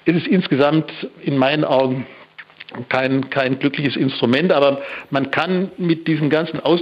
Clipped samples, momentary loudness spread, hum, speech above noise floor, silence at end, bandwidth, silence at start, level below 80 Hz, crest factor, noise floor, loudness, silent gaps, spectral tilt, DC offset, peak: under 0.1%; 11 LU; none; 23 dB; 0 s; 7.2 kHz; 0.05 s; -62 dBFS; 16 dB; -41 dBFS; -18 LUFS; none; -8 dB/octave; under 0.1%; -2 dBFS